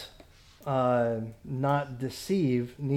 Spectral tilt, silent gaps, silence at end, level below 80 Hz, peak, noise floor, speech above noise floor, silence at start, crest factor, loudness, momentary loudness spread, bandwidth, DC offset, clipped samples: -7 dB/octave; none; 0 s; -58 dBFS; -14 dBFS; -54 dBFS; 26 dB; 0 s; 16 dB; -29 LUFS; 11 LU; 16 kHz; under 0.1%; under 0.1%